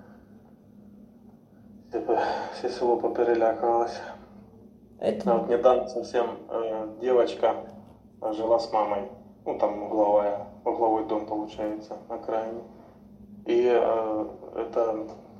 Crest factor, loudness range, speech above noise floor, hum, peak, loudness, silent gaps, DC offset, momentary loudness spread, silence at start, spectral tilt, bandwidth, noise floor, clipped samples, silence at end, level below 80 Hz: 20 dB; 3 LU; 27 dB; none; -8 dBFS; -27 LUFS; none; under 0.1%; 14 LU; 0 s; -6.5 dB/octave; 9.2 kHz; -53 dBFS; under 0.1%; 0 s; -62 dBFS